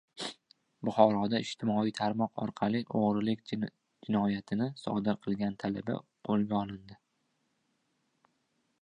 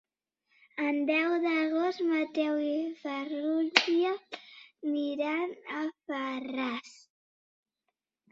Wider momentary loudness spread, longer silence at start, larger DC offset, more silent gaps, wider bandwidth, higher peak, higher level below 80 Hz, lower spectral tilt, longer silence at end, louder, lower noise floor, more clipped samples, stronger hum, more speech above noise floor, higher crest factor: about the same, 12 LU vs 11 LU; second, 0.15 s vs 0.75 s; neither; neither; first, 10.5 kHz vs 7.8 kHz; second, -8 dBFS vs -2 dBFS; first, -68 dBFS vs -80 dBFS; first, -7 dB/octave vs -2.5 dB/octave; first, 1.85 s vs 1.4 s; about the same, -32 LUFS vs -31 LUFS; second, -78 dBFS vs -85 dBFS; neither; neither; second, 47 dB vs 55 dB; second, 24 dB vs 30 dB